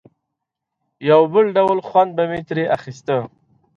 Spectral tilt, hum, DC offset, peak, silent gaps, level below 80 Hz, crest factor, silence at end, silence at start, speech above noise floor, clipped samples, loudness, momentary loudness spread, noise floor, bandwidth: -7 dB/octave; none; under 0.1%; -2 dBFS; none; -60 dBFS; 18 dB; 0.5 s; 1 s; 63 dB; under 0.1%; -18 LUFS; 10 LU; -80 dBFS; 7.4 kHz